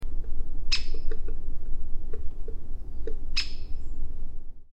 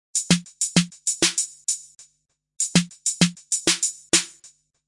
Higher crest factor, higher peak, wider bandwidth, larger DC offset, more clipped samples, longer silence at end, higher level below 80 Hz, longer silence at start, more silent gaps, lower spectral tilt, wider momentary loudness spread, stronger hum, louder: second, 10 dB vs 22 dB; second, -10 dBFS vs -2 dBFS; second, 7 kHz vs 11.5 kHz; neither; neither; second, 0.1 s vs 0.4 s; first, -28 dBFS vs -60 dBFS; second, 0 s vs 0.15 s; neither; about the same, -3.5 dB/octave vs -2.5 dB/octave; first, 13 LU vs 7 LU; neither; second, -36 LUFS vs -22 LUFS